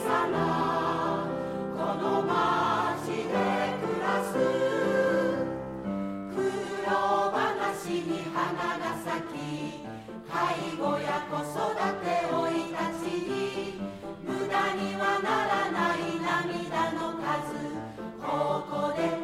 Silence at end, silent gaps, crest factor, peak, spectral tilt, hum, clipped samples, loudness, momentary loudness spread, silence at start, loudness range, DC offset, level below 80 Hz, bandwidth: 0 s; none; 16 dB; -12 dBFS; -5.5 dB/octave; none; under 0.1%; -29 LUFS; 9 LU; 0 s; 4 LU; under 0.1%; -62 dBFS; 16 kHz